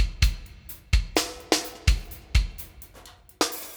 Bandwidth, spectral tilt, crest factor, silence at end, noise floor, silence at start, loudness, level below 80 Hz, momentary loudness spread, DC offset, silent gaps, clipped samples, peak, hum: over 20 kHz; -3.5 dB/octave; 24 dB; 0 s; -50 dBFS; 0 s; -27 LUFS; -28 dBFS; 17 LU; under 0.1%; none; under 0.1%; -2 dBFS; none